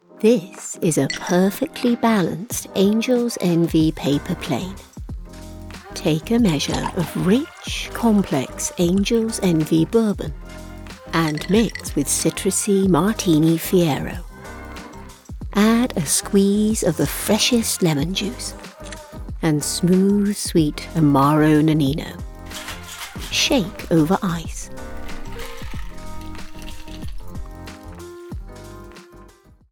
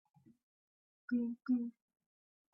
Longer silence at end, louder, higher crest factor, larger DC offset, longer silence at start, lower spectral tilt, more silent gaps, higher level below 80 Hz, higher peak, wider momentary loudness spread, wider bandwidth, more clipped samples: second, 0.45 s vs 0.85 s; first, -19 LUFS vs -39 LUFS; about the same, 18 dB vs 16 dB; neither; second, 0.15 s vs 1.1 s; second, -5 dB/octave vs -7.5 dB/octave; neither; first, -38 dBFS vs -86 dBFS; first, -2 dBFS vs -26 dBFS; first, 20 LU vs 11 LU; first, 19 kHz vs 5.6 kHz; neither